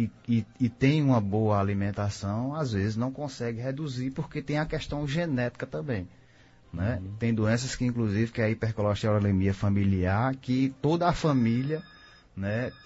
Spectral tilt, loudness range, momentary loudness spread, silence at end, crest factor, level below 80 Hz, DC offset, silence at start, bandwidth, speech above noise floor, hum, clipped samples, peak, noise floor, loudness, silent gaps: -7 dB/octave; 5 LU; 8 LU; 0.1 s; 18 dB; -50 dBFS; under 0.1%; 0 s; 8 kHz; 29 dB; none; under 0.1%; -10 dBFS; -56 dBFS; -28 LUFS; none